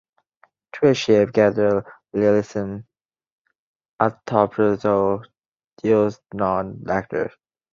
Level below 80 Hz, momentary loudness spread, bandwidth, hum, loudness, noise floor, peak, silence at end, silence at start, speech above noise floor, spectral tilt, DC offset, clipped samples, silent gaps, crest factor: -54 dBFS; 11 LU; 7.6 kHz; none; -21 LUFS; -61 dBFS; -2 dBFS; 0.45 s; 0.75 s; 42 dB; -6.5 dB/octave; under 0.1%; under 0.1%; 3.32-3.45 s, 3.59-3.80 s, 3.89-3.98 s, 5.48-5.52 s, 5.73-5.77 s; 20 dB